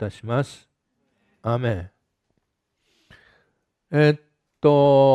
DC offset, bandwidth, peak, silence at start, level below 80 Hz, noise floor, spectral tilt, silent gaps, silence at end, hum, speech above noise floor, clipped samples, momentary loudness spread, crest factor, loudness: under 0.1%; 9.8 kHz; -4 dBFS; 0 s; -60 dBFS; -74 dBFS; -8 dB/octave; none; 0 s; none; 56 dB; under 0.1%; 16 LU; 18 dB; -21 LUFS